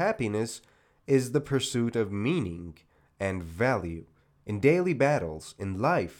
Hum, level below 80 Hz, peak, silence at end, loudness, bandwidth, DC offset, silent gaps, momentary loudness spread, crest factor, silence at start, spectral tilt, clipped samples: none; -58 dBFS; -10 dBFS; 0.05 s; -28 LUFS; 17.5 kHz; under 0.1%; none; 17 LU; 20 dB; 0 s; -6 dB/octave; under 0.1%